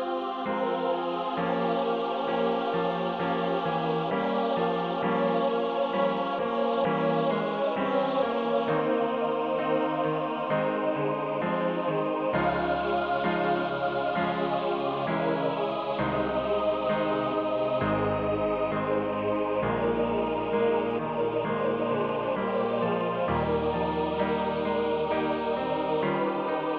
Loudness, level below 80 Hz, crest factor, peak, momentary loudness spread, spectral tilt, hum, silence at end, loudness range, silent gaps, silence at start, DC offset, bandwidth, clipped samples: -28 LUFS; -54 dBFS; 14 dB; -12 dBFS; 2 LU; -8.5 dB/octave; none; 0 s; 1 LU; none; 0 s; under 0.1%; 6 kHz; under 0.1%